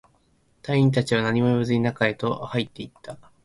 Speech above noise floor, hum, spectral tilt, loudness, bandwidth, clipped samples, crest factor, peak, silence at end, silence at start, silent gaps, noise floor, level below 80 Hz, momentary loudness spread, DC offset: 40 dB; none; -7 dB/octave; -23 LUFS; 11.5 kHz; under 0.1%; 18 dB; -6 dBFS; 0.3 s; 0.65 s; none; -63 dBFS; -56 dBFS; 18 LU; under 0.1%